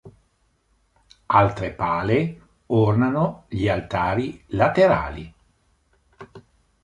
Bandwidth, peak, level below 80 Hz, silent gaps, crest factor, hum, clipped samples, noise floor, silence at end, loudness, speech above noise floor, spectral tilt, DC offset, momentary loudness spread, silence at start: 10.5 kHz; -2 dBFS; -46 dBFS; none; 22 dB; none; under 0.1%; -66 dBFS; 0.45 s; -21 LUFS; 45 dB; -8 dB/octave; under 0.1%; 10 LU; 0.05 s